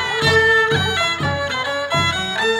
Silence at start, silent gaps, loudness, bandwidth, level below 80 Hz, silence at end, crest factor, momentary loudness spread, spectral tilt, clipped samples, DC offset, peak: 0 s; none; -17 LUFS; 18.5 kHz; -46 dBFS; 0 s; 16 dB; 8 LU; -3.5 dB/octave; under 0.1%; under 0.1%; -2 dBFS